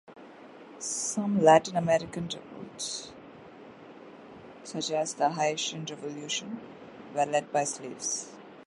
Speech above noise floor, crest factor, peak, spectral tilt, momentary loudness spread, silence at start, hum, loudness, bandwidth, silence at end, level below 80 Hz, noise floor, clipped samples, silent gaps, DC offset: 20 dB; 24 dB; -8 dBFS; -3.5 dB/octave; 25 LU; 0.1 s; none; -29 LUFS; 11.5 kHz; 0.05 s; -70 dBFS; -49 dBFS; under 0.1%; none; under 0.1%